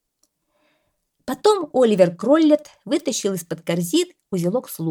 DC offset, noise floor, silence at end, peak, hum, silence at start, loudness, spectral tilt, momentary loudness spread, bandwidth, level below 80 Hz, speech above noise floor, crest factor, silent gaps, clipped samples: under 0.1%; -70 dBFS; 0 s; -2 dBFS; none; 1.25 s; -20 LUFS; -5 dB/octave; 10 LU; 19 kHz; -66 dBFS; 51 dB; 18 dB; none; under 0.1%